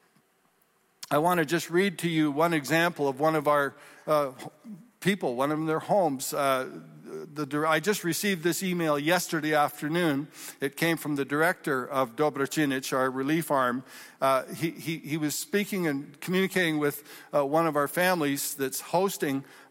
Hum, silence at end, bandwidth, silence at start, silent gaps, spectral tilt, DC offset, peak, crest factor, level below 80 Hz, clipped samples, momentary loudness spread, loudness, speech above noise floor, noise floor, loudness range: none; 0.15 s; 16.5 kHz; 1 s; none; -4.5 dB/octave; under 0.1%; -12 dBFS; 16 dB; -74 dBFS; under 0.1%; 9 LU; -27 LUFS; 40 dB; -68 dBFS; 2 LU